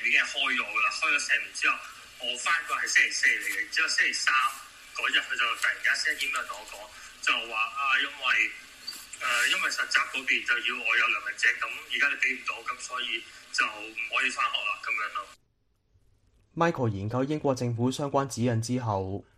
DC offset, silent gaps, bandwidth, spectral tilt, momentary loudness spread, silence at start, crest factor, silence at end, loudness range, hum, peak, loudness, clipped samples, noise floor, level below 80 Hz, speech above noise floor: under 0.1%; none; 14.5 kHz; -3 dB/octave; 10 LU; 0 s; 20 dB; 0.15 s; 5 LU; none; -8 dBFS; -26 LUFS; under 0.1%; -71 dBFS; -66 dBFS; 42 dB